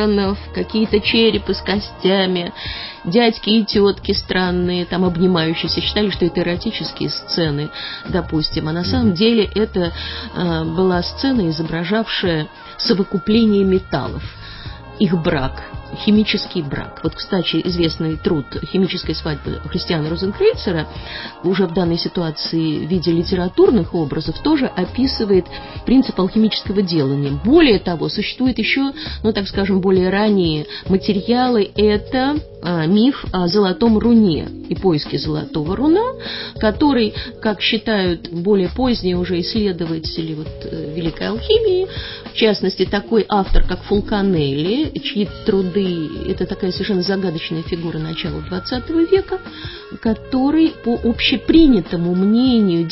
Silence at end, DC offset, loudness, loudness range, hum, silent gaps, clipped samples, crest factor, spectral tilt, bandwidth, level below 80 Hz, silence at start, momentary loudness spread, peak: 0 s; under 0.1%; -18 LUFS; 4 LU; none; none; under 0.1%; 16 dB; -9.5 dB/octave; 5.8 kHz; -34 dBFS; 0 s; 9 LU; 0 dBFS